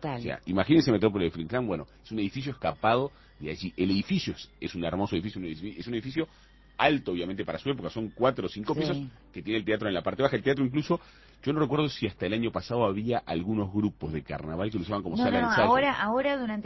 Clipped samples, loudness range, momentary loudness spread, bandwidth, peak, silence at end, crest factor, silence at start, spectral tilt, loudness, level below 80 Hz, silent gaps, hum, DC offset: under 0.1%; 4 LU; 12 LU; 6.2 kHz; -8 dBFS; 0 s; 22 dB; 0 s; -7 dB/octave; -29 LUFS; -52 dBFS; none; none; under 0.1%